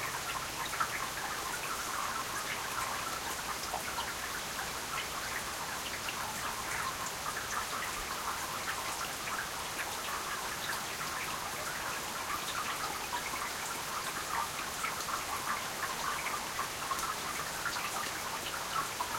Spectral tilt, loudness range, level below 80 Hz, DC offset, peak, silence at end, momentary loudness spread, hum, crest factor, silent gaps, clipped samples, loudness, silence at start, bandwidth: -1 dB/octave; 1 LU; -60 dBFS; under 0.1%; -18 dBFS; 0 s; 2 LU; none; 18 dB; none; under 0.1%; -36 LUFS; 0 s; 16.5 kHz